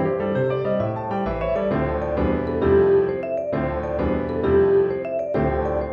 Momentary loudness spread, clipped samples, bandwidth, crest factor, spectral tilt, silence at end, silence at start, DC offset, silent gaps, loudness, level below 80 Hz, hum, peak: 8 LU; under 0.1%; 4.9 kHz; 14 dB; -10 dB/octave; 0 s; 0 s; under 0.1%; none; -22 LUFS; -36 dBFS; none; -6 dBFS